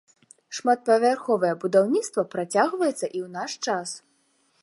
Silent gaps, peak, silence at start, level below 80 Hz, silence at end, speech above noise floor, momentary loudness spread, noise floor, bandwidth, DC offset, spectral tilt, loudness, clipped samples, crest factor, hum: none; -6 dBFS; 0.5 s; -80 dBFS; 0.65 s; 43 dB; 11 LU; -67 dBFS; 11.5 kHz; under 0.1%; -4 dB/octave; -24 LUFS; under 0.1%; 20 dB; none